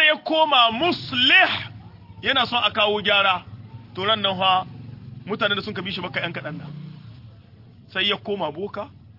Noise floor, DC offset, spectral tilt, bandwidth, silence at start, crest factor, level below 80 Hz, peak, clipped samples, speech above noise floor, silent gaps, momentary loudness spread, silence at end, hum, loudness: -47 dBFS; under 0.1%; -5 dB/octave; 5.8 kHz; 0 s; 20 dB; -60 dBFS; -4 dBFS; under 0.1%; 26 dB; none; 22 LU; 0.05 s; none; -20 LUFS